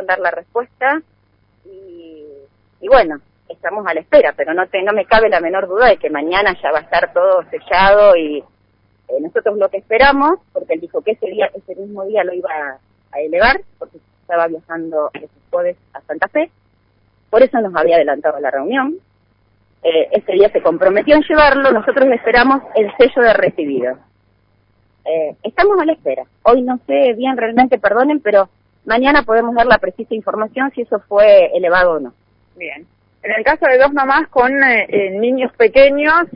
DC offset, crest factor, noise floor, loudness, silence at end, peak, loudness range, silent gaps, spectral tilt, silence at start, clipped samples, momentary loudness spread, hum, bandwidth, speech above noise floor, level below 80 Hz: under 0.1%; 14 dB; -57 dBFS; -14 LUFS; 0 s; 0 dBFS; 7 LU; none; -8.5 dB/octave; 0 s; under 0.1%; 13 LU; none; 5.4 kHz; 43 dB; -42 dBFS